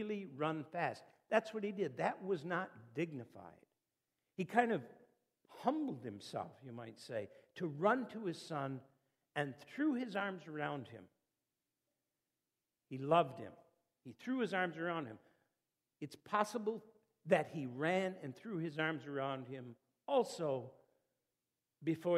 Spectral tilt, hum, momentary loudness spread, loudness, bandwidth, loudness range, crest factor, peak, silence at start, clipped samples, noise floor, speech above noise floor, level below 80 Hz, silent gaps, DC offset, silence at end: -6 dB/octave; none; 17 LU; -40 LUFS; 15 kHz; 3 LU; 24 dB; -16 dBFS; 0 s; under 0.1%; under -90 dBFS; over 50 dB; -90 dBFS; none; under 0.1%; 0 s